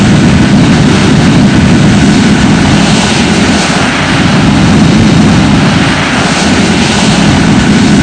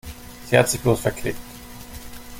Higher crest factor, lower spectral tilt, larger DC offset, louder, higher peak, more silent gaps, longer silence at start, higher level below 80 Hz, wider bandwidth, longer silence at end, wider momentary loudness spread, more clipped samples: second, 6 dB vs 22 dB; about the same, -5 dB/octave vs -4.5 dB/octave; neither; first, -6 LUFS vs -21 LUFS; about the same, 0 dBFS vs -2 dBFS; neither; about the same, 0 s vs 0.05 s; first, -22 dBFS vs -42 dBFS; second, 10 kHz vs 17 kHz; about the same, 0 s vs 0 s; second, 2 LU vs 21 LU; first, 2% vs under 0.1%